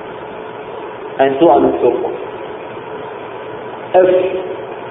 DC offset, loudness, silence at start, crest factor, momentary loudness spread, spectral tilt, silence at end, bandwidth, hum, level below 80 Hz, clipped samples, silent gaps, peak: under 0.1%; -14 LUFS; 0 s; 16 dB; 17 LU; -10 dB/octave; 0 s; 3.9 kHz; none; -52 dBFS; under 0.1%; none; 0 dBFS